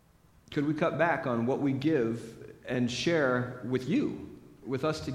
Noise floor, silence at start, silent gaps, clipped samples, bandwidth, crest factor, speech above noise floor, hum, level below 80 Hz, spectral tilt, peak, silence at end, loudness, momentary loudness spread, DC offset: -61 dBFS; 0.5 s; none; under 0.1%; 13.5 kHz; 20 dB; 31 dB; none; -62 dBFS; -6 dB/octave; -12 dBFS; 0 s; -30 LUFS; 14 LU; under 0.1%